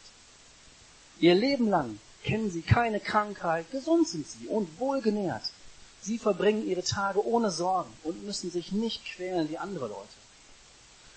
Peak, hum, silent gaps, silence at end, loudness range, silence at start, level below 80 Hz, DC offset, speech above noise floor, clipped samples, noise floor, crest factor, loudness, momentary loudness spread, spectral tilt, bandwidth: -10 dBFS; none; none; 1.05 s; 4 LU; 0.05 s; -56 dBFS; under 0.1%; 27 dB; under 0.1%; -55 dBFS; 20 dB; -29 LUFS; 12 LU; -5.5 dB/octave; 8.8 kHz